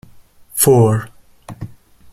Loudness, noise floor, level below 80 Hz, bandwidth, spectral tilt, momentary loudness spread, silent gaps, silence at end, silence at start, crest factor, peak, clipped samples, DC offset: -14 LUFS; -43 dBFS; -48 dBFS; 15.5 kHz; -5.5 dB/octave; 24 LU; none; 0.45 s; 0.55 s; 18 dB; 0 dBFS; under 0.1%; under 0.1%